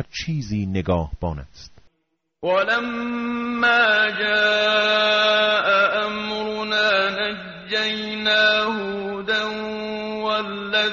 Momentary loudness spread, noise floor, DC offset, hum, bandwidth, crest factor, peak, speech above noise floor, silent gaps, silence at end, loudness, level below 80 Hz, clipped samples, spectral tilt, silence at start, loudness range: 11 LU; -73 dBFS; under 0.1%; none; 7.4 kHz; 16 dB; -6 dBFS; 53 dB; none; 0 s; -20 LUFS; -46 dBFS; under 0.1%; -1.5 dB/octave; 0 s; 6 LU